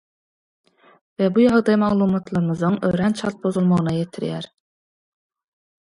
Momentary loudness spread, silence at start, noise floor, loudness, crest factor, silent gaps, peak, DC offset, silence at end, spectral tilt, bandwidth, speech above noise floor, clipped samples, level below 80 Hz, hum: 11 LU; 1.2 s; under -90 dBFS; -20 LUFS; 18 dB; none; -4 dBFS; under 0.1%; 1.5 s; -8 dB/octave; 11.5 kHz; over 71 dB; under 0.1%; -54 dBFS; none